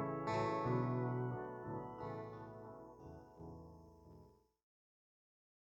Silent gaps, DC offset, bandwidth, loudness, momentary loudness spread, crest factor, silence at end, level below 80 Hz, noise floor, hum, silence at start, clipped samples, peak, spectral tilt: none; under 0.1%; 7.8 kHz; -42 LUFS; 23 LU; 18 dB; 1.4 s; -70 dBFS; -65 dBFS; none; 0 s; under 0.1%; -26 dBFS; -8.5 dB/octave